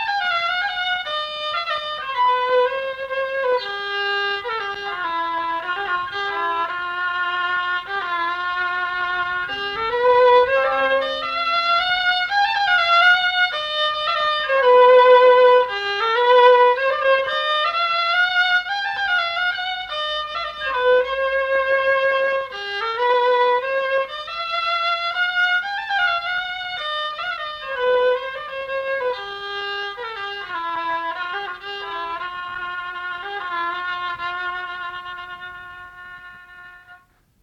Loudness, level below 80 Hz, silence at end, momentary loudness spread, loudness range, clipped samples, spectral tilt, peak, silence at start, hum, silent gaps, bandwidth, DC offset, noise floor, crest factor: -19 LUFS; -56 dBFS; 0.45 s; 14 LU; 12 LU; under 0.1%; -2 dB/octave; -2 dBFS; 0 s; none; none; 7.6 kHz; under 0.1%; -52 dBFS; 18 dB